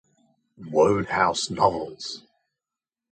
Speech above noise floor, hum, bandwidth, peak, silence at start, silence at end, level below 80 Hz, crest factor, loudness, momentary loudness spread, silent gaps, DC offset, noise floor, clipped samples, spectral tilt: 67 dB; none; 9.4 kHz; -6 dBFS; 0.6 s; 0.95 s; -56 dBFS; 20 dB; -23 LUFS; 14 LU; none; under 0.1%; -90 dBFS; under 0.1%; -4 dB/octave